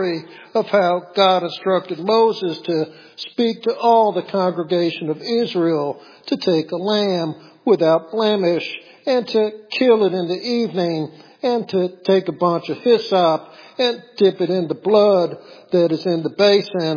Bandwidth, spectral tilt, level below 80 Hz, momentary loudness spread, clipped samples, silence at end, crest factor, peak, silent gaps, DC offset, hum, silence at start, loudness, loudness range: 5.4 kHz; -6.5 dB/octave; -78 dBFS; 9 LU; under 0.1%; 0 s; 16 dB; -2 dBFS; none; under 0.1%; none; 0 s; -19 LUFS; 2 LU